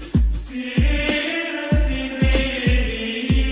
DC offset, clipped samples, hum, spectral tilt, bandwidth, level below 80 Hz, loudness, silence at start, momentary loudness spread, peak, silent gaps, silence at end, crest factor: under 0.1%; under 0.1%; none; -10 dB/octave; 4 kHz; -22 dBFS; -21 LUFS; 0 s; 5 LU; -6 dBFS; none; 0 s; 14 dB